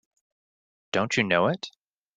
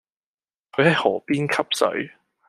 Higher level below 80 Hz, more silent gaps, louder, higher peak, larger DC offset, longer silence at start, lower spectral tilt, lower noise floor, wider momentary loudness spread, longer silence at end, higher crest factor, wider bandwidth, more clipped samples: about the same, -68 dBFS vs -68 dBFS; neither; second, -25 LUFS vs -21 LUFS; second, -6 dBFS vs -2 dBFS; neither; first, 0.95 s vs 0.75 s; about the same, -4.5 dB/octave vs -5 dB/octave; about the same, under -90 dBFS vs under -90 dBFS; about the same, 12 LU vs 12 LU; about the same, 0.5 s vs 0.4 s; about the same, 22 dB vs 20 dB; second, 9.4 kHz vs 14 kHz; neither